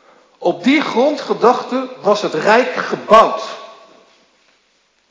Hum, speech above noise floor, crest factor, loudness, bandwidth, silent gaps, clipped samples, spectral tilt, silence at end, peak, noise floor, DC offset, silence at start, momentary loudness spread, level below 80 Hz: none; 45 dB; 16 dB; -15 LUFS; 8 kHz; none; 0.2%; -4.5 dB/octave; 1.4 s; 0 dBFS; -59 dBFS; under 0.1%; 0.4 s; 12 LU; -60 dBFS